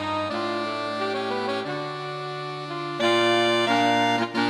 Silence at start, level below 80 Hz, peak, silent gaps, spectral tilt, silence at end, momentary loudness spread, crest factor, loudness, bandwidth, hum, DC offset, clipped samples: 0 s; -68 dBFS; -10 dBFS; none; -4.5 dB/octave; 0 s; 11 LU; 16 dB; -24 LUFS; 14 kHz; none; under 0.1%; under 0.1%